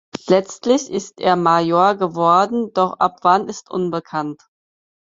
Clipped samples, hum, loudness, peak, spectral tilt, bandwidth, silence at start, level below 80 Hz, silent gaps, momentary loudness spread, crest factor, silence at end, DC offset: under 0.1%; none; -18 LUFS; -2 dBFS; -5.5 dB/octave; 7.8 kHz; 0.25 s; -64 dBFS; none; 10 LU; 16 dB; 0.7 s; under 0.1%